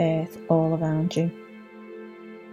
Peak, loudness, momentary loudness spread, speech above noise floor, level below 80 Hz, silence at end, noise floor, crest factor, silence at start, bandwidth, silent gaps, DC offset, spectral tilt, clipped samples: -8 dBFS; -25 LUFS; 21 LU; 20 dB; -64 dBFS; 0 s; -43 dBFS; 20 dB; 0 s; 14 kHz; none; under 0.1%; -8 dB/octave; under 0.1%